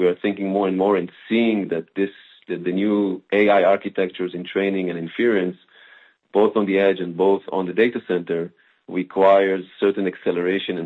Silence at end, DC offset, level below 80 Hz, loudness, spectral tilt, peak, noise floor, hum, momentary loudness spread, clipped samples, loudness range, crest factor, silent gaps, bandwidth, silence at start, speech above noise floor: 0 s; under 0.1%; -68 dBFS; -21 LUFS; -8.5 dB/octave; -4 dBFS; -51 dBFS; none; 10 LU; under 0.1%; 2 LU; 18 dB; none; 4.3 kHz; 0 s; 31 dB